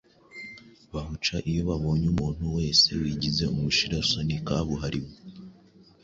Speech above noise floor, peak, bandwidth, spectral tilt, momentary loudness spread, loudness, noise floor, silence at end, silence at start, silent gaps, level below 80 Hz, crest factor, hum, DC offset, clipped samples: 29 dB; -8 dBFS; 7.8 kHz; -4.5 dB/octave; 21 LU; -26 LUFS; -55 dBFS; 0.5 s; 0.35 s; none; -42 dBFS; 20 dB; none; under 0.1%; under 0.1%